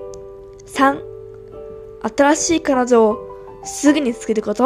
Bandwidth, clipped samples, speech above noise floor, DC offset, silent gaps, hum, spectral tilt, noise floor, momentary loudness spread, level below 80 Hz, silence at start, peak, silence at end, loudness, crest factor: 14 kHz; under 0.1%; 21 dB; under 0.1%; none; none; -3.5 dB/octave; -37 dBFS; 21 LU; -48 dBFS; 0 s; 0 dBFS; 0 s; -17 LUFS; 18 dB